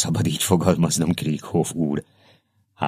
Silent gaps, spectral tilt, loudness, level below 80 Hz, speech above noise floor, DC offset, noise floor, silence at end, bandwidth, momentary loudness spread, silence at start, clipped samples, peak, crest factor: none; -5 dB/octave; -22 LUFS; -54 dBFS; 38 dB; under 0.1%; -60 dBFS; 0 s; 14.5 kHz; 6 LU; 0 s; under 0.1%; -2 dBFS; 22 dB